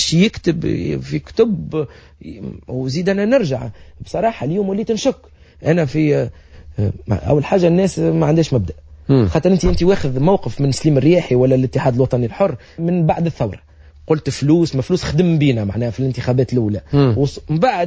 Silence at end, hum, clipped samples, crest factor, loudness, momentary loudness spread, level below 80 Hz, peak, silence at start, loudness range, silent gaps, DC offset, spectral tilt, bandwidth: 0 s; none; under 0.1%; 14 dB; -17 LUFS; 10 LU; -36 dBFS; -2 dBFS; 0 s; 4 LU; none; under 0.1%; -7 dB/octave; 8 kHz